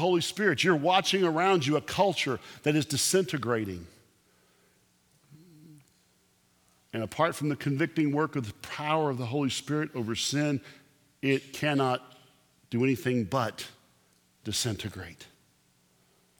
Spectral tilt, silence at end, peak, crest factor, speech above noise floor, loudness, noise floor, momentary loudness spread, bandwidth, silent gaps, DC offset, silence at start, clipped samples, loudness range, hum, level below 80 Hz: -4.5 dB/octave; 1.15 s; -8 dBFS; 22 dB; 39 dB; -28 LUFS; -67 dBFS; 12 LU; 19.5 kHz; none; under 0.1%; 0 s; under 0.1%; 9 LU; none; -66 dBFS